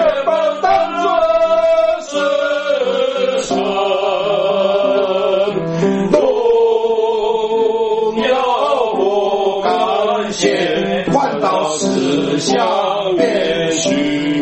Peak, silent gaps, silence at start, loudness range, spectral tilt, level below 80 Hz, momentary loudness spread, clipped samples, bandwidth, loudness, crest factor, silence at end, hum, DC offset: 0 dBFS; none; 0 s; 1 LU; -4.5 dB/octave; -50 dBFS; 3 LU; under 0.1%; 8.8 kHz; -15 LUFS; 14 dB; 0 s; none; under 0.1%